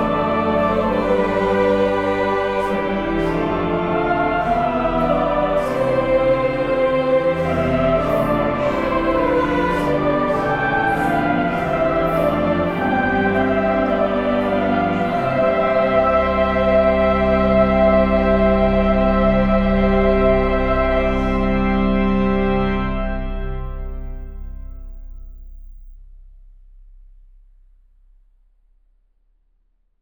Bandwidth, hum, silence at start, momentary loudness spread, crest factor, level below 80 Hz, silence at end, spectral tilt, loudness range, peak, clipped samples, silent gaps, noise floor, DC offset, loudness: 13 kHz; none; 0 s; 5 LU; 14 dB; -30 dBFS; 3.85 s; -8 dB/octave; 5 LU; -4 dBFS; under 0.1%; none; -63 dBFS; 0.3%; -18 LUFS